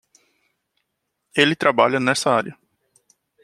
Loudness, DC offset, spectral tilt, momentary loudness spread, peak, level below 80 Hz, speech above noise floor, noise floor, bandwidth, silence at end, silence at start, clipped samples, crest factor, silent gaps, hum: -18 LUFS; under 0.1%; -4 dB/octave; 8 LU; 0 dBFS; -68 dBFS; 58 dB; -77 dBFS; 14 kHz; 0.9 s; 1.35 s; under 0.1%; 22 dB; none; none